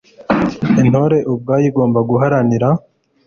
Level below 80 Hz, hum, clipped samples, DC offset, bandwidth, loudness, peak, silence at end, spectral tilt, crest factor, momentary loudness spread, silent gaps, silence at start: -46 dBFS; none; under 0.1%; under 0.1%; 7 kHz; -14 LUFS; 0 dBFS; 0.5 s; -8.5 dB/octave; 14 dB; 5 LU; none; 0.2 s